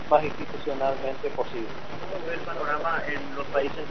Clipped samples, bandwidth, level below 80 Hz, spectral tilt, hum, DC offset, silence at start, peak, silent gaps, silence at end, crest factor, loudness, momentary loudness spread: under 0.1%; 6.4 kHz; -52 dBFS; -3 dB/octave; none; 3%; 0 s; -6 dBFS; none; 0 s; 22 dB; -29 LUFS; 9 LU